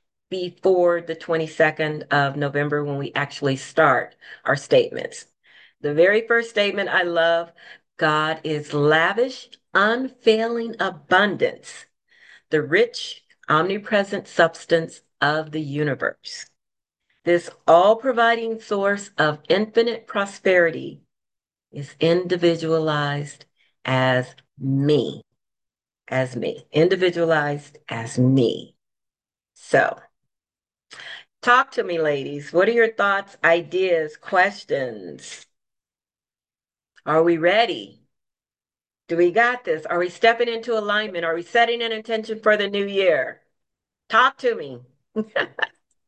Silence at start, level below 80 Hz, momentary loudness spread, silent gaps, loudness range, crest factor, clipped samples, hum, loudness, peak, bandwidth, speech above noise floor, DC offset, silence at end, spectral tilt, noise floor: 0.3 s; -70 dBFS; 14 LU; none; 4 LU; 20 dB; under 0.1%; none; -21 LUFS; -2 dBFS; 9.8 kHz; over 69 dB; under 0.1%; 0.4 s; -5.5 dB/octave; under -90 dBFS